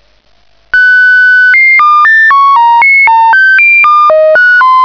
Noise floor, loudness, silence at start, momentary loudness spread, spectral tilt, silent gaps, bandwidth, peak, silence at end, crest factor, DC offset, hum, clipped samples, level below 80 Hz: -48 dBFS; -3 LUFS; 0.75 s; 3 LU; -1 dB/octave; none; 5.4 kHz; 0 dBFS; 0 s; 4 dB; 0.4%; none; under 0.1%; -48 dBFS